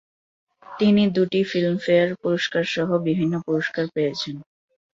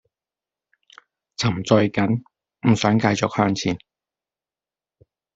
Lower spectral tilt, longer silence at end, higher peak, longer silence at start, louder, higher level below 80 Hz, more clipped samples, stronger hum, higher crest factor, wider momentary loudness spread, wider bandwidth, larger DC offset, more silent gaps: about the same, -6.5 dB/octave vs -6 dB/octave; second, 0.55 s vs 1.6 s; second, -6 dBFS vs -2 dBFS; second, 0.7 s vs 1.4 s; about the same, -22 LUFS vs -21 LUFS; second, -64 dBFS vs -56 dBFS; neither; neither; about the same, 16 dB vs 20 dB; about the same, 7 LU vs 9 LU; about the same, 7.6 kHz vs 8 kHz; neither; neither